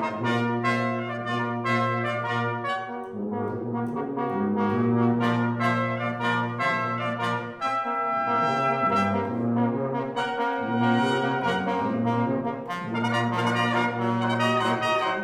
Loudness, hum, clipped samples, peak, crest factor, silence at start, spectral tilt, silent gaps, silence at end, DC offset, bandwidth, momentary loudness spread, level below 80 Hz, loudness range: -25 LUFS; none; under 0.1%; -10 dBFS; 16 dB; 0 s; -6.5 dB/octave; none; 0 s; under 0.1%; 11.5 kHz; 7 LU; -68 dBFS; 3 LU